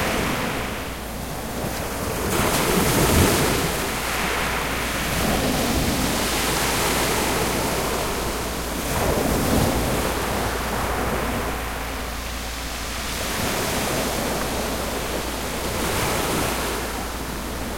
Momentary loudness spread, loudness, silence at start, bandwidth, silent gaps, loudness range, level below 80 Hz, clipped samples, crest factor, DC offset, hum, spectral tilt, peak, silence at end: 9 LU; -23 LUFS; 0 s; 16.5 kHz; none; 5 LU; -34 dBFS; under 0.1%; 18 dB; under 0.1%; none; -3.5 dB/octave; -4 dBFS; 0 s